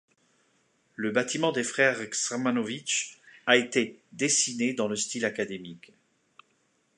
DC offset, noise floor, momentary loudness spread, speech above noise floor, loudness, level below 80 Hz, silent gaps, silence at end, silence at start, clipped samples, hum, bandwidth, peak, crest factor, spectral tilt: under 0.1%; -71 dBFS; 11 LU; 43 dB; -27 LUFS; -78 dBFS; none; 1.2 s; 1 s; under 0.1%; none; 11 kHz; -4 dBFS; 24 dB; -2.5 dB/octave